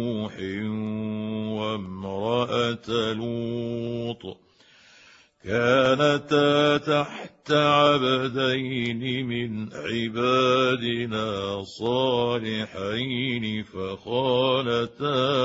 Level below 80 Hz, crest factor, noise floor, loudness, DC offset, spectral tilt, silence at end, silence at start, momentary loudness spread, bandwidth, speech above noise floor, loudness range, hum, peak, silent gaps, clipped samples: -60 dBFS; 20 dB; -55 dBFS; -25 LUFS; under 0.1%; -6 dB/octave; 0 s; 0 s; 11 LU; 8 kHz; 31 dB; 6 LU; none; -6 dBFS; none; under 0.1%